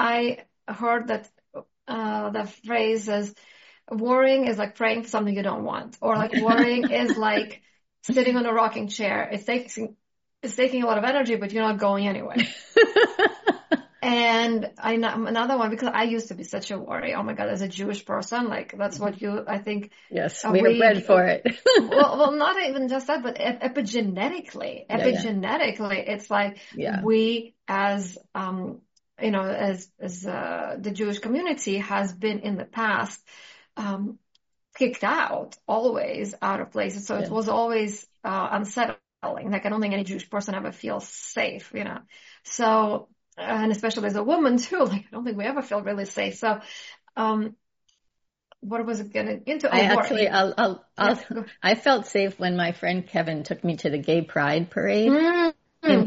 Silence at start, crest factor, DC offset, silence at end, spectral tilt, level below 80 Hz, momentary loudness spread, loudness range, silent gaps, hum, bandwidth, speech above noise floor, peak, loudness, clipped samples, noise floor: 0 s; 20 dB; under 0.1%; 0 s; -3.5 dB/octave; -70 dBFS; 13 LU; 7 LU; none; none; 8 kHz; 52 dB; -4 dBFS; -24 LUFS; under 0.1%; -77 dBFS